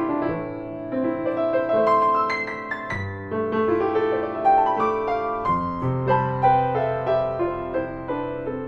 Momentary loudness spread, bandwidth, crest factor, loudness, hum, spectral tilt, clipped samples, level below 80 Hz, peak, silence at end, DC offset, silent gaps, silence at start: 10 LU; 8 kHz; 16 dB; -23 LUFS; none; -8.5 dB/octave; under 0.1%; -48 dBFS; -8 dBFS; 0 s; under 0.1%; none; 0 s